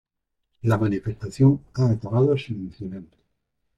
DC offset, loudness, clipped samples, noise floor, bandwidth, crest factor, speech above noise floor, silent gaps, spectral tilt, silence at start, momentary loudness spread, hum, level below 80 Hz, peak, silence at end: under 0.1%; -23 LUFS; under 0.1%; -77 dBFS; 9.4 kHz; 18 dB; 55 dB; none; -9 dB/octave; 0.65 s; 15 LU; none; -54 dBFS; -6 dBFS; 0.75 s